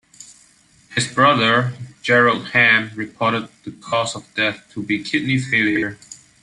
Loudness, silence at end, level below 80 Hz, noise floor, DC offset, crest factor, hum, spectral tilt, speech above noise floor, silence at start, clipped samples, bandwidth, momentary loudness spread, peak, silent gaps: -18 LUFS; 0.25 s; -58 dBFS; -53 dBFS; under 0.1%; 18 dB; none; -4.5 dB/octave; 35 dB; 0.2 s; under 0.1%; 11.5 kHz; 14 LU; -2 dBFS; none